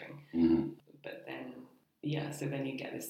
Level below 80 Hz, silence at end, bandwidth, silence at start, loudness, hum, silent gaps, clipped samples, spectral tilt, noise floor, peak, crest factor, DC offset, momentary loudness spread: -64 dBFS; 0 s; 14.5 kHz; 0 s; -35 LUFS; none; none; under 0.1%; -6.5 dB/octave; -56 dBFS; -18 dBFS; 18 dB; under 0.1%; 19 LU